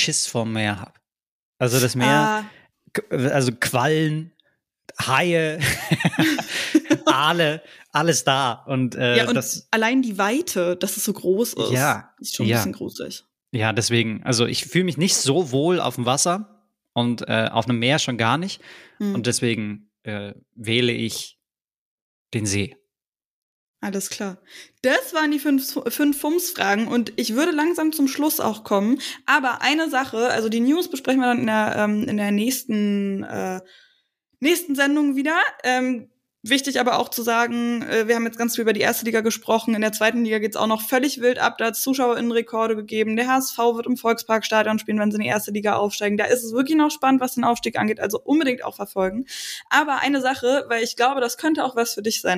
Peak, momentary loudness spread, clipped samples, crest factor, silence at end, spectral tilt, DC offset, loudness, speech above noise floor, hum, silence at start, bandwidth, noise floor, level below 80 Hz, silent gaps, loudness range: -4 dBFS; 9 LU; under 0.1%; 18 dB; 0 s; -4 dB/octave; under 0.1%; -21 LUFS; over 69 dB; none; 0 s; 15.5 kHz; under -90 dBFS; -62 dBFS; 1.28-1.53 s, 21.77-22.25 s, 23.08-23.12 s, 23.25-23.74 s; 4 LU